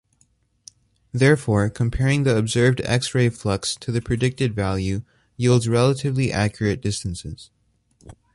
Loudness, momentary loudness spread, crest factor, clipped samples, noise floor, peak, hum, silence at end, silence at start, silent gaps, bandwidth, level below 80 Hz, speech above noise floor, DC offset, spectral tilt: -21 LUFS; 10 LU; 18 dB; under 0.1%; -63 dBFS; -2 dBFS; none; 0.2 s; 1.15 s; none; 11.5 kHz; -42 dBFS; 43 dB; under 0.1%; -6 dB/octave